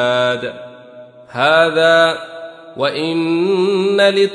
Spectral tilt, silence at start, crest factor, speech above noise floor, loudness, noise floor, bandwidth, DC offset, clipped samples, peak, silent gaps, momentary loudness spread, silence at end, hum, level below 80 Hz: -5 dB/octave; 0 s; 14 dB; 24 dB; -14 LUFS; -39 dBFS; 10.5 kHz; under 0.1%; under 0.1%; -2 dBFS; none; 19 LU; 0 s; none; -64 dBFS